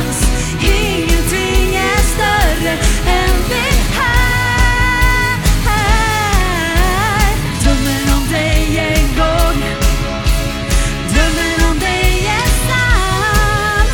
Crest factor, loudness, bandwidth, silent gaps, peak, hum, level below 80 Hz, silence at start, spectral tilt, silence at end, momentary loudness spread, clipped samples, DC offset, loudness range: 12 dB; -14 LUFS; 18.5 kHz; none; 0 dBFS; none; -16 dBFS; 0 s; -4 dB/octave; 0 s; 3 LU; under 0.1%; under 0.1%; 2 LU